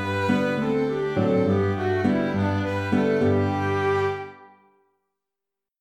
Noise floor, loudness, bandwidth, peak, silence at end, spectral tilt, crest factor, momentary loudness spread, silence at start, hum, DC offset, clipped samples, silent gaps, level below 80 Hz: -87 dBFS; -23 LUFS; 10 kHz; -8 dBFS; 1.35 s; -7.5 dB/octave; 16 dB; 4 LU; 0 s; none; under 0.1%; under 0.1%; none; -58 dBFS